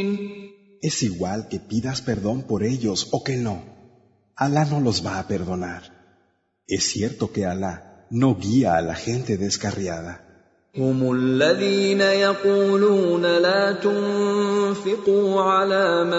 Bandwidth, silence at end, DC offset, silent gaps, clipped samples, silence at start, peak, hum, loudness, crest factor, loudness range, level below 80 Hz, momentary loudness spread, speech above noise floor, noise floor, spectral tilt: 8 kHz; 0 s; under 0.1%; none; under 0.1%; 0 s; -6 dBFS; none; -22 LUFS; 16 dB; 7 LU; -54 dBFS; 12 LU; 45 dB; -66 dBFS; -5 dB/octave